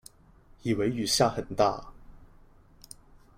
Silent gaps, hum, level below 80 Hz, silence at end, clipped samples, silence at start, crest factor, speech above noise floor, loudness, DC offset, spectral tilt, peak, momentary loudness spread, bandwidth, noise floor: none; none; -52 dBFS; 1.1 s; under 0.1%; 0.65 s; 22 dB; 30 dB; -27 LUFS; under 0.1%; -4 dB/octave; -10 dBFS; 25 LU; 16.5 kHz; -57 dBFS